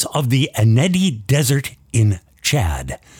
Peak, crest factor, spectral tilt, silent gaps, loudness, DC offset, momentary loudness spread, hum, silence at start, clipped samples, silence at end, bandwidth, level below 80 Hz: -4 dBFS; 14 dB; -5 dB/octave; none; -18 LUFS; under 0.1%; 7 LU; none; 0 s; under 0.1%; 0.25 s; 17.5 kHz; -36 dBFS